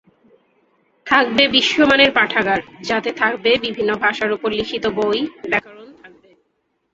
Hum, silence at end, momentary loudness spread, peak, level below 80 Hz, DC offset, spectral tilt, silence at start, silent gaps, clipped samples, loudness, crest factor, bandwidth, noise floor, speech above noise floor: none; 0.85 s; 9 LU; 0 dBFS; -54 dBFS; under 0.1%; -3.5 dB/octave; 1.05 s; none; under 0.1%; -17 LUFS; 18 dB; 7.8 kHz; -69 dBFS; 52 dB